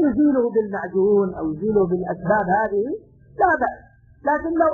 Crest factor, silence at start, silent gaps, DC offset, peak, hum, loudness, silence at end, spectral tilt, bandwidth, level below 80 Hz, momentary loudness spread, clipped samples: 14 dB; 0 s; none; under 0.1%; -6 dBFS; none; -21 LUFS; 0 s; -11.5 dB/octave; 2 kHz; -50 dBFS; 7 LU; under 0.1%